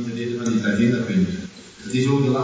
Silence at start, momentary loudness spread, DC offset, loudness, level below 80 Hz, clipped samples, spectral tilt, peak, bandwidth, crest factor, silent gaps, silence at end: 0 s; 13 LU; under 0.1%; -21 LUFS; -50 dBFS; under 0.1%; -6.5 dB/octave; -6 dBFS; 8 kHz; 14 dB; none; 0 s